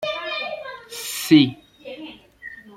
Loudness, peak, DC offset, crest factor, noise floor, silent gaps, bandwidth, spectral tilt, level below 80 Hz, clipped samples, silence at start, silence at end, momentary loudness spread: -20 LUFS; -2 dBFS; under 0.1%; 20 dB; -42 dBFS; none; 16 kHz; -4.5 dB/octave; -64 dBFS; under 0.1%; 0 s; 0 s; 24 LU